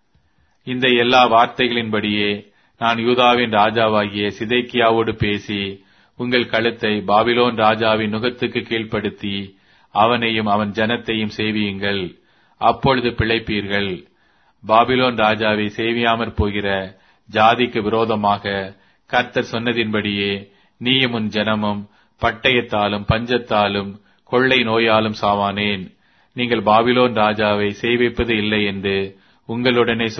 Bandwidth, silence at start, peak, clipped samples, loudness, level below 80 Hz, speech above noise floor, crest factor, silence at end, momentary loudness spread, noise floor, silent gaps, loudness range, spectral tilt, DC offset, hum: 6.4 kHz; 0.65 s; 0 dBFS; under 0.1%; -18 LUFS; -44 dBFS; 43 dB; 18 dB; 0 s; 10 LU; -61 dBFS; none; 3 LU; -6.5 dB/octave; under 0.1%; none